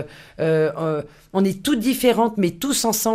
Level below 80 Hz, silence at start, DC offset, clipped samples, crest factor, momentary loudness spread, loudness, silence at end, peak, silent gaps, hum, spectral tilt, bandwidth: -52 dBFS; 0 s; under 0.1%; under 0.1%; 18 dB; 8 LU; -21 LUFS; 0 s; -4 dBFS; none; none; -4.5 dB/octave; 15.5 kHz